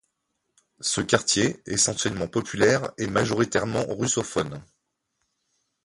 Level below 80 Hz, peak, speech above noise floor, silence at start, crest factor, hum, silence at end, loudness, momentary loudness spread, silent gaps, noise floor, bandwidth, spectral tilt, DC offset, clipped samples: -54 dBFS; -2 dBFS; 53 dB; 0.8 s; 24 dB; none; 1.2 s; -24 LUFS; 7 LU; none; -78 dBFS; 11.5 kHz; -3.5 dB/octave; under 0.1%; under 0.1%